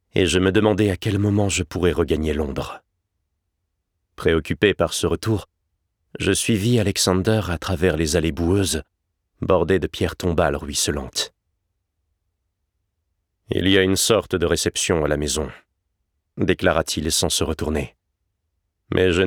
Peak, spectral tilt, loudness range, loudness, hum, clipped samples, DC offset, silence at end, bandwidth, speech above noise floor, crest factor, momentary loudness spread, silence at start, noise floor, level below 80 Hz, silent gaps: -4 dBFS; -4.5 dB/octave; 4 LU; -21 LUFS; none; under 0.1%; under 0.1%; 0 s; 19.5 kHz; 56 dB; 18 dB; 8 LU; 0.15 s; -76 dBFS; -38 dBFS; none